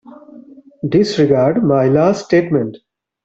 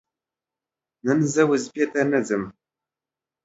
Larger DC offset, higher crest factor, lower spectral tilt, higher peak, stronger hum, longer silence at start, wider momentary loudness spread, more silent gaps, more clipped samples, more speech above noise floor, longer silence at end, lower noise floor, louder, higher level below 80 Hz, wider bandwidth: neither; about the same, 14 dB vs 18 dB; first, -7 dB/octave vs -5.5 dB/octave; first, 0 dBFS vs -6 dBFS; neither; second, 0.1 s vs 1.05 s; second, 6 LU vs 9 LU; neither; neither; second, 27 dB vs 68 dB; second, 0.5 s vs 0.95 s; second, -40 dBFS vs -90 dBFS; first, -14 LUFS vs -22 LUFS; first, -52 dBFS vs -66 dBFS; about the same, 8 kHz vs 8 kHz